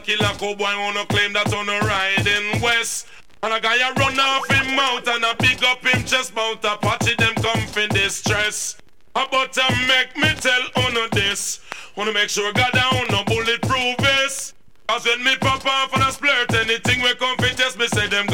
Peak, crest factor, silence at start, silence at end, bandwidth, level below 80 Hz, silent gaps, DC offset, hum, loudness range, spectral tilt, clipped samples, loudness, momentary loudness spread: -2 dBFS; 18 dB; 0 s; 0 s; 17 kHz; -44 dBFS; none; 0.8%; none; 2 LU; -3 dB/octave; under 0.1%; -18 LUFS; 7 LU